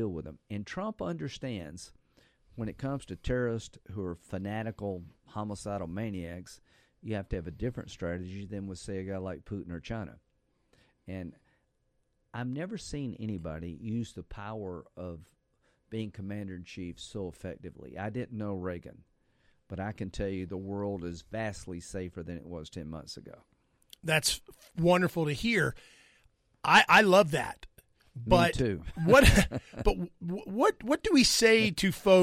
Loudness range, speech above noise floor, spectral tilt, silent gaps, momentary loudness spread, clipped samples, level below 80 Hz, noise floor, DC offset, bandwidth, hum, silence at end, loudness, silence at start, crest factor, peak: 16 LU; 44 dB; -4.5 dB/octave; none; 20 LU; under 0.1%; -46 dBFS; -75 dBFS; under 0.1%; 16 kHz; none; 0 s; -30 LUFS; 0 s; 22 dB; -10 dBFS